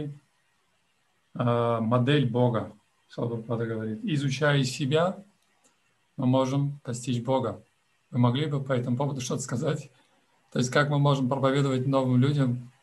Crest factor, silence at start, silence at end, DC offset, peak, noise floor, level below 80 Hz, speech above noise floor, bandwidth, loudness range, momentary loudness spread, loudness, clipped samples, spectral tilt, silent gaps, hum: 20 dB; 0 s; 0.15 s; under 0.1%; -8 dBFS; -71 dBFS; -68 dBFS; 46 dB; 12 kHz; 3 LU; 11 LU; -27 LUFS; under 0.1%; -6.5 dB/octave; none; none